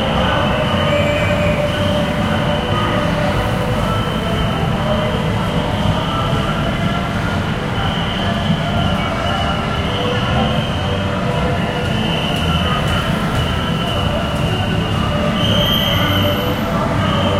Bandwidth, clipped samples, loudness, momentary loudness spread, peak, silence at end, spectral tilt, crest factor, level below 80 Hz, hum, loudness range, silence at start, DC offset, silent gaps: 16.5 kHz; under 0.1%; -17 LUFS; 3 LU; -2 dBFS; 0 s; -6 dB/octave; 14 dB; -28 dBFS; none; 2 LU; 0 s; under 0.1%; none